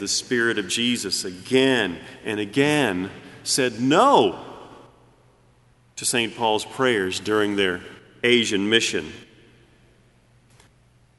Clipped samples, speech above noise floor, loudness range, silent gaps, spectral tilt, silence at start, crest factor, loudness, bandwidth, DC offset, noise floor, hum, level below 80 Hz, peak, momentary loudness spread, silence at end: under 0.1%; 36 dB; 4 LU; none; -3 dB/octave; 0 s; 22 dB; -21 LUFS; 12 kHz; under 0.1%; -57 dBFS; none; -62 dBFS; -2 dBFS; 15 LU; 1.95 s